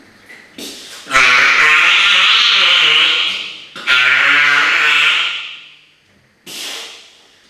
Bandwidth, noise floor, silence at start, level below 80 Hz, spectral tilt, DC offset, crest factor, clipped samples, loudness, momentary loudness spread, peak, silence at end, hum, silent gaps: 15 kHz; -53 dBFS; 0.3 s; -56 dBFS; 1 dB/octave; under 0.1%; 14 dB; under 0.1%; -9 LUFS; 21 LU; 0 dBFS; 0.55 s; none; none